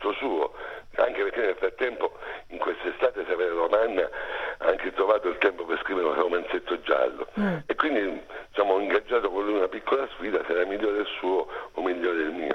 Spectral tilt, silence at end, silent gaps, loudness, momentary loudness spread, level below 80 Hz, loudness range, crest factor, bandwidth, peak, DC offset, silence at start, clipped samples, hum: -6.5 dB/octave; 0 s; none; -27 LUFS; 8 LU; -54 dBFS; 2 LU; 20 dB; 6.4 kHz; -6 dBFS; under 0.1%; 0 s; under 0.1%; none